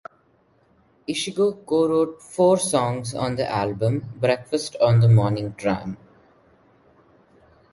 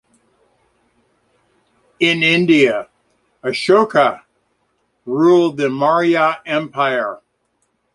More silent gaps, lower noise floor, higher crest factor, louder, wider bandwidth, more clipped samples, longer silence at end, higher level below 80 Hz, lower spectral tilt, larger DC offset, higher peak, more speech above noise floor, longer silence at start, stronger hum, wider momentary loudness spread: neither; second, -61 dBFS vs -67 dBFS; about the same, 18 dB vs 16 dB; second, -22 LUFS vs -15 LUFS; about the same, 11.5 kHz vs 11.5 kHz; neither; first, 1.75 s vs 0.8 s; first, -54 dBFS vs -64 dBFS; about the same, -6 dB/octave vs -5.5 dB/octave; neither; second, -4 dBFS vs 0 dBFS; second, 40 dB vs 52 dB; second, 1.1 s vs 2 s; neither; second, 10 LU vs 13 LU